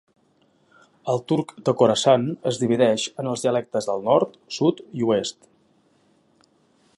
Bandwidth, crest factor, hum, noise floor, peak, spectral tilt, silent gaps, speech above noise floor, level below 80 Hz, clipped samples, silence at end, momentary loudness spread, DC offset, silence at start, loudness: 11.5 kHz; 20 dB; none; -62 dBFS; -4 dBFS; -5 dB/octave; none; 41 dB; -68 dBFS; under 0.1%; 1.65 s; 8 LU; under 0.1%; 1.05 s; -22 LUFS